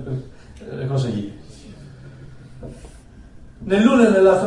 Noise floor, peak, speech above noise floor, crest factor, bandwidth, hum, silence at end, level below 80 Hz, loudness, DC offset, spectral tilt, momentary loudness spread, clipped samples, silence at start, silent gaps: -42 dBFS; 0 dBFS; 25 dB; 20 dB; 11 kHz; none; 0 s; -46 dBFS; -18 LUFS; under 0.1%; -7 dB/octave; 28 LU; under 0.1%; 0 s; none